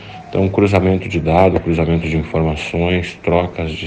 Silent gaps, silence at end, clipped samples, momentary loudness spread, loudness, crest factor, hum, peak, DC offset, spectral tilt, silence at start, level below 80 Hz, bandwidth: none; 0 s; under 0.1%; 6 LU; -16 LUFS; 16 dB; none; 0 dBFS; under 0.1%; -7.5 dB/octave; 0 s; -32 dBFS; 9 kHz